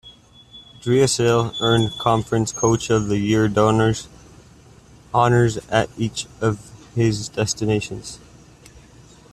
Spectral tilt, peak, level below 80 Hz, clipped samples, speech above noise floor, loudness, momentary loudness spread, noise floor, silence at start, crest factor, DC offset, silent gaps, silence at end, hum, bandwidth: -5 dB/octave; -2 dBFS; -46 dBFS; under 0.1%; 28 dB; -20 LUFS; 14 LU; -47 dBFS; 0.05 s; 18 dB; under 0.1%; none; 0.55 s; none; 13 kHz